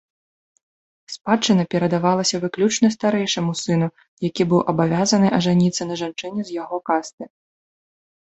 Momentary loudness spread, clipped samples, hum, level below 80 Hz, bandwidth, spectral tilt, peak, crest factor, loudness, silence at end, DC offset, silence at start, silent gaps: 11 LU; under 0.1%; none; -60 dBFS; 8.2 kHz; -5 dB/octave; -2 dBFS; 18 dB; -20 LUFS; 1 s; under 0.1%; 1.1 s; 4.08-4.17 s, 7.13-7.18 s